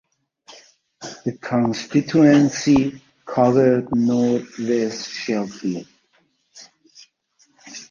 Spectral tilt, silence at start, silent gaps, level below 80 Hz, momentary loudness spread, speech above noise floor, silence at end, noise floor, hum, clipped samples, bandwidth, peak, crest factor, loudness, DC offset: -6 dB/octave; 0.5 s; none; -56 dBFS; 17 LU; 45 dB; 0.05 s; -64 dBFS; none; under 0.1%; 7.4 kHz; -2 dBFS; 18 dB; -19 LUFS; under 0.1%